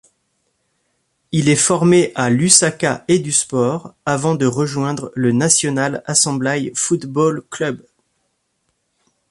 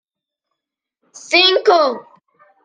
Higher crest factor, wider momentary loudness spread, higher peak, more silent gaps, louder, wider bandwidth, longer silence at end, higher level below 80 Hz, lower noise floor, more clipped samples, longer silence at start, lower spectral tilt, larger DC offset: about the same, 18 dB vs 18 dB; about the same, 11 LU vs 10 LU; about the same, 0 dBFS vs -2 dBFS; neither; second, -16 LUFS vs -13 LUFS; first, 14 kHz vs 9.8 kHz; first, 1.55 s vs 0.65 s; first, -56 dBFS vs -74 dBFS; second, -69 dBFS vs -82 dBFS; neither; about the same, 1.3 s vs 1.3 s; first, -4 dB/octave vs -1 dB/octave; neither